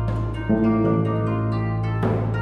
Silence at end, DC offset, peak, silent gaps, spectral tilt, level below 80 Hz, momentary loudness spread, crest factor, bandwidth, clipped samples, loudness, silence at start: 0 s; under 0.1%; -8 dBFS; none; -10 dB/octave; -36 dBFS; 5 LU; 14 dB; 5 kHz; under 0.1%; -22 LUFS; 0 s